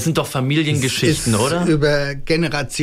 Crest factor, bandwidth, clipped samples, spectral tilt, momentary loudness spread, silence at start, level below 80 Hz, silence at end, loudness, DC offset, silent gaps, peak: 14 dB; 16 kHz; under 0.1%; -5 dB/octave; 4 LU; 0 s; -36 dBFS; 0 s; -18 LUFS; under 0.1%; none; -4 dBFS